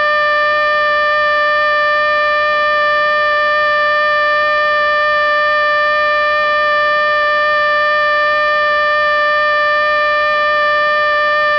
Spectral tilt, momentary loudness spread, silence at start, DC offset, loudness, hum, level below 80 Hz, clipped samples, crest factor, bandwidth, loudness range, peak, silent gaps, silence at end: -2.5 dB/octave; 0 LU; 0 s; under 0.1%; -12 LUFS; none; -48 dBFS; under 0.1%; 10 dB; 8 kHz; 0 LU; -4 dBFS; none; 0 s